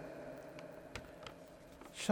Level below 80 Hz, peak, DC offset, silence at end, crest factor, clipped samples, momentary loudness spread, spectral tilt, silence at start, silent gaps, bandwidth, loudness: -68 dBFS; -18 dBFS; under 0.1%; 0 s; 26 dB; under 0.1%; 8 LU; -4 dB/octave; 0 s; none; over 20 kHz; -50 LUFS